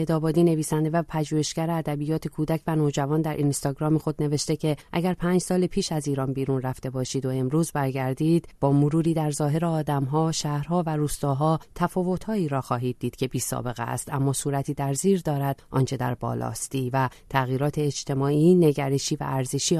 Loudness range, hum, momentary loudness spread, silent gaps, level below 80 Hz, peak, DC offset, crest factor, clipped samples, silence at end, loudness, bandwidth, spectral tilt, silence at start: 3 LU; none; 6 LU; none; -50 dBFS; -8 dBFS; under 0.1%; 16 dB; under 0.1%; 0 s; -25 LUFS; 13.5 kHz; -6 dB/octave; 0 s